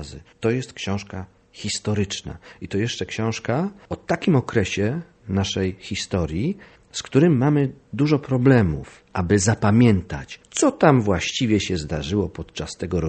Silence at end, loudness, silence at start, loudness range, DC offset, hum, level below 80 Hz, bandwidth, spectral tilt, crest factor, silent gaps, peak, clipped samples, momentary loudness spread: 0 s; -22 LUFS; 0 s; 7 LU; under 0.1%; none; -44 dBFS; 8.8 kHz; -5.5 dB/octave; 22 dB; none; 0 dBFS; under 0.1%; 15 LU